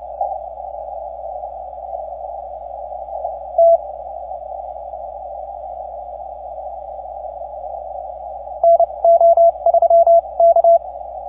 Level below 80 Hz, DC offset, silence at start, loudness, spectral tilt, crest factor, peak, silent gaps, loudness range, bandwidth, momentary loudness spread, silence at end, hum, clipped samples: -48 dBFS; under 0.1%; 0 s; -14 LUFS; -9.5 dB/octave; 12 dB; -4 dBFS; none; 17 LU; 1.3 kHz; 19 LU; 0 s; none; under 0.1%